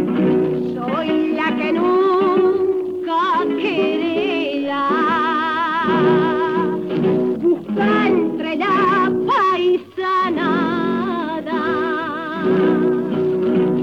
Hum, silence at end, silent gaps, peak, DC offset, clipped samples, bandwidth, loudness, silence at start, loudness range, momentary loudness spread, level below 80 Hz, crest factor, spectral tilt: none; 0 s; none; -4 dBFS; 0.1%; under 0.1%; 6.6 kHz; -18 LUFS; 0 s; 2 LU; 6 LU; -62 dBFS; 12 dB; -7.5 dB/octave